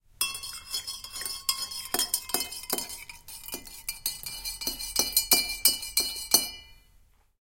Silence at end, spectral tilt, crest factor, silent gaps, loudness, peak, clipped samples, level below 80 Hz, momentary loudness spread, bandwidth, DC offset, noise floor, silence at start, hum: 0.65 s; 1 dB/octave; 26 dB; none; -27 LUFS; -4 dBFS; under 0.1%; -54 dBFS; 15 LU; 17 kHz; under 0.1%; -61 dBFS; 0.2 s; none